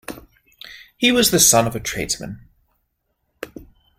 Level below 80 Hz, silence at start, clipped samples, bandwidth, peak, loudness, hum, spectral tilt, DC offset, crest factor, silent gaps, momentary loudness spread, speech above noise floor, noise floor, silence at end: -46 dBFS; 0.1 s; under 0.1%; 16.5 kHz; 0 dBFS; -16 LUFS; none; -2.5 dB/octave; under 0.1%; 22 dB; none; 26 LU; 54 dB; -72 dBFS; 0.35 s